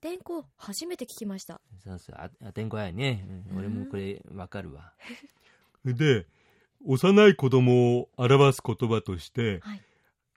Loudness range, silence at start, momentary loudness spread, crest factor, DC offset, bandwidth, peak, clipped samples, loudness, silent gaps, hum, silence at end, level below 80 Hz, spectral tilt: 13 LU; 0.05 s; 25 LU; 20 dB; under 0.1%; 15.5 kHz; -6 dBFS; under 0.1%; -25 LUFS; none; none; 0.6 s; -62 dBFS; -6.5 dB/octave